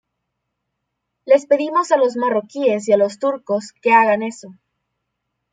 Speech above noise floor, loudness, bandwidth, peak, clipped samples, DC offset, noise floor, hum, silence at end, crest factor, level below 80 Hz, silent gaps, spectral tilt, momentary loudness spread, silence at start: 60 dB; -17 LUFS; 9.4 kHz; -2 dBFS; under 0.1%; under 0.1%; -77 dBFS; 60 Hz at -65 dBFS; 1 s; 18 dB; -72 dBFS; none; -5 dB/octave; 9 LU; 1.25 s